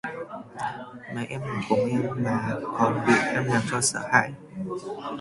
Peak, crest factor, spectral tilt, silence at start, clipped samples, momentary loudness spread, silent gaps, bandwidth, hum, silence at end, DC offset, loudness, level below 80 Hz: -2 dBFS; 24 dB; -4.5 dB/octave; 0.05 s; under 0.1%; 14 LU; none; 11.5 kHz; none; 0 s; under 0.1%; -26 LUFS; -60 dBFS